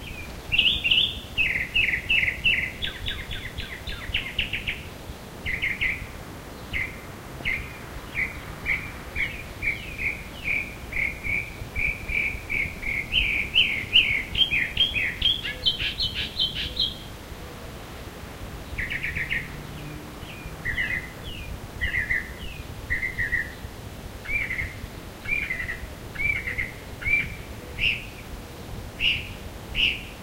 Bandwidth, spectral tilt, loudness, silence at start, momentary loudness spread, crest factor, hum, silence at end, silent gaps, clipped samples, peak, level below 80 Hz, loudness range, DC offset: 16 kHz; -3 dB/octave; -25 LUFS; 0 s; 18 LU; 22 dB; none; 0 s; none; under 0.1%; -6 dBFS; -40 dBFS; 9 LU; under 0.1%